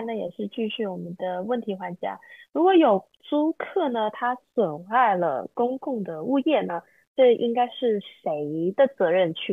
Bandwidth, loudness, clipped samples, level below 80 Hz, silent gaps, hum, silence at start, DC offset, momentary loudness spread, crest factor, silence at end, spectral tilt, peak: 3.9 kHz; -24 LUFS; under 0.1%; -78 dBFS; 7.07-7.15 s; none; 0 s; under 0.1%; 12 LU; 16 dB; 0 s; -8 dB/octave; -8 dBFS